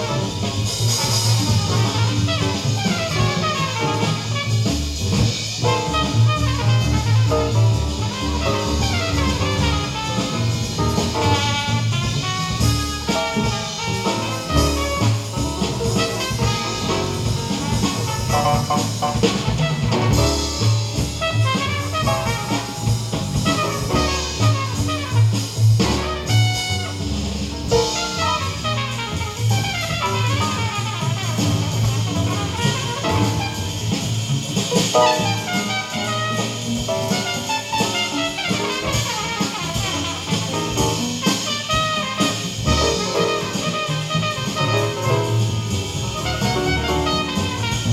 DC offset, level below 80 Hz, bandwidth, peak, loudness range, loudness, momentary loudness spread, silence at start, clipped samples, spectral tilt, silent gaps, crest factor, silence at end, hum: under 0.1%; -34 dBFS; 15.5 kHz; -2 dBFS; 2 LU; -20 LUFS; 5 LU; 0 s; under 0.1%; -4.5 dB/octave; none; 18 dB; 0 s; none